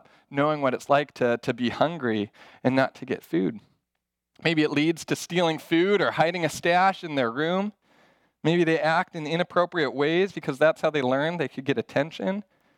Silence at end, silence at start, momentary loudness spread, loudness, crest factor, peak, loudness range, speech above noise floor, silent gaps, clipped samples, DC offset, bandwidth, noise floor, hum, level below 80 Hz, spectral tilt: 0.35 s; 0.3 s; 8 LU; -25 LUFS; 20 dB; -6 dBFS; 3 LU; 58 dB; none; under 0.1%; under 0.1%; 16.5 kHz; -83 dBFS; none; -70 dBFS; -5.5 dB/octave